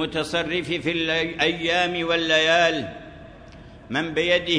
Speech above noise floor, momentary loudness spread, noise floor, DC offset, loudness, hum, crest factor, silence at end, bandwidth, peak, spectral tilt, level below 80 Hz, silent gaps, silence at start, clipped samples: 21 dB; 11 LU; -44 dBFS; under 0.1%; -22 LUFS; none; 18 dB; 0 s; 11 kHz; -6 dBFS; -4 dB/octave; -50 dBFS; none; 0 s; under 0.1%